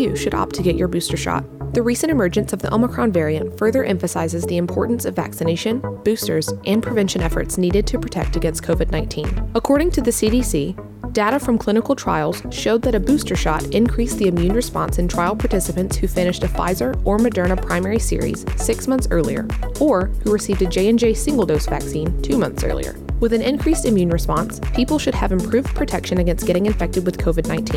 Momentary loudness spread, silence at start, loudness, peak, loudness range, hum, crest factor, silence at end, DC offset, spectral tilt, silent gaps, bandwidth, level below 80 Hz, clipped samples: 5 LU; 0 s; -19 LUFS; -6 dBFS; 2 LU; none; 12 dB; 0 s; under 0.1%; -5.5 dB/octave; none; 18.5 kHz; -26 dBFS; under 0.1%